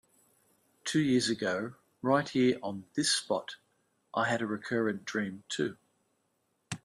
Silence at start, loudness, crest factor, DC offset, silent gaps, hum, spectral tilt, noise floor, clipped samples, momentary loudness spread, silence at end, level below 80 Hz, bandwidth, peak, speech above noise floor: 0.85 s; -31 LUFS; 20 dB; under 0.1%; none; none; -4 dB/octave; -77 dBFS; under 0.1%; 10 LU; 0.1 s; -74 dBFS; 12.5 kHz; -14 dBFS; 46 dB